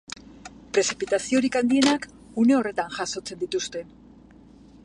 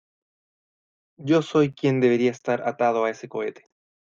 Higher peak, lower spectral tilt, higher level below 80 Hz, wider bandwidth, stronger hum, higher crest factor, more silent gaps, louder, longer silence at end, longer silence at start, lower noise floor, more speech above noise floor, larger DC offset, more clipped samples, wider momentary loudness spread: about the same, -6 dBFS vs -8 dBFS; second, -3 dB/octave vs -7 dB/octave; first, -58 dBFS vs -68 dBFS; first, 11 kHz vs 7.6 kHz; neither; about the same, 20 dB vs 16 dB; neither; about the same, -24 LUFS vs -23 LUFS; first, 1 s vs 0.55 s; second, 0.3 s vs 1.2 s; second, -50 dBFS vs under -90 dBFS; second, 27 dB vs over 68 dB; neither; neither; first, 18 LU vs 11 LU